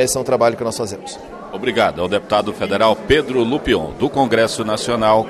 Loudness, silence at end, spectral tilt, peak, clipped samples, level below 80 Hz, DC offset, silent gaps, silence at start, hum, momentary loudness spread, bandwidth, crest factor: -17 LUFS; 0 s; -4 dB/octave; -2 dBFS; under 0.1%; -40 dBFS; under 0.1%; none; 0 s; none; 10 LU; 14 kHz; 16 dB